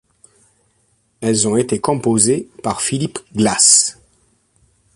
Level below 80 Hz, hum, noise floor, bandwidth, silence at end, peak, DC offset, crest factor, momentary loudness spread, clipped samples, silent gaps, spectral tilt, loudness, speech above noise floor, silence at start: -52 dBFS; none; -61 dBFS; 11.5 kHz; 1.05 s; 0 dBFS; under 0.1%; 18 dB; 13 LU; under 0.1%; none; -3 dB/octave; -15 LUFS; 46 dB; 1.2 s